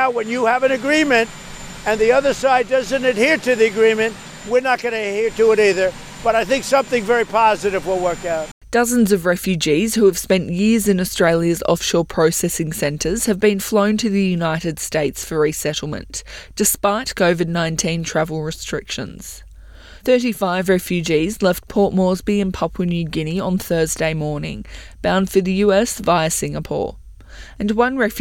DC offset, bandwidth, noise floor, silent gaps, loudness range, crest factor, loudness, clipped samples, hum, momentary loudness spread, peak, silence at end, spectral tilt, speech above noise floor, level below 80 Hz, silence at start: under 0.1%; 18 kHz; -40 dBFS; 8.51-8.61 s; 4 LU; 16 dB; -18 LUFS; under 0.1%; none; 10 LU; -2 dBFS; 0 s; -4.5 dB/octave; 22 dB; -42 dBFS; 0 s